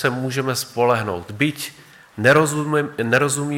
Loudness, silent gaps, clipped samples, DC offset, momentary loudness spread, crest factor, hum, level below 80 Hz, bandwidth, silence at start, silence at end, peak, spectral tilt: -19 LUFS; none; under 0.1%; under 0.1%; 12 LU; 16 dB; none; -62 dBFS; 17.5 kHz; 0 s; 0 s; -4 dBFS; -4.5 dB/octave